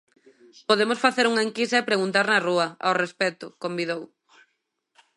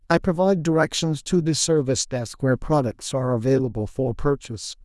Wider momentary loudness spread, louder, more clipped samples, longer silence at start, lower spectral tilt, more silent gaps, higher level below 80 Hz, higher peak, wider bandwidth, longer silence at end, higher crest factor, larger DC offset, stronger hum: first, 10 LU vs 6 LU; about the same, -23 LUFS vs -22 LUFS; neither; first, 0.7 s vs 0.1 s; second, -3.5 dB/octave vs -5 dB/octave; neither; second, -78 dBFS vs -42 dBFS; about the same, -4 dBFS vs -4 dBFS; about the same, 11.5 kHz vs 12 kHz; first, 1.1 s vs 0.1 s; about the same, 20 dB vs 18 dB; neither; neither